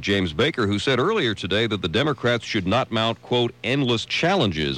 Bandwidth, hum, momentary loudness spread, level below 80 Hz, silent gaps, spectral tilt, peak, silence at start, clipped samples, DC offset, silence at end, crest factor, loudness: 12 kHz; none; 3 LU; -50 dBFS; none; -5.5 dB/octave; -10 dBFS; 0 s; under 0.1%; under 0.1%; 0 s; 12 dB; -22 LUFS